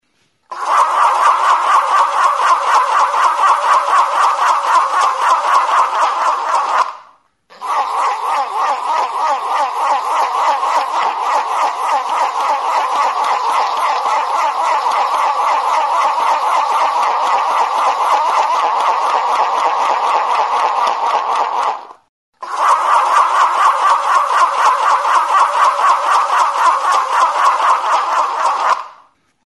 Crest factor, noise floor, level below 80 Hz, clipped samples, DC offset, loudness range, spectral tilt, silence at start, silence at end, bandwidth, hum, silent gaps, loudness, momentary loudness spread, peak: 14 dB; -59 dBFS; -76 dBFS; under 0.1%; under 0.1%; 4 LU; 1 dB/octave; 0.5 s; 0.55 s; 12 kHz; none; 22.09-22.33 s; -14 LUFS; 5 LU; 0 dBFS